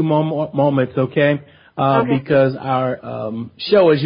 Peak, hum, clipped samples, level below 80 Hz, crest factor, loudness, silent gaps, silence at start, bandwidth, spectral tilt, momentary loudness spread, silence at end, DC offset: -2 dBFS; none; under 0.1%; -56 dBFS; 14 dB; -18 LUFS; none; 0 s; 5.2 kHz; -12 dB/octave; 11 LU; 0 s; under 0.1%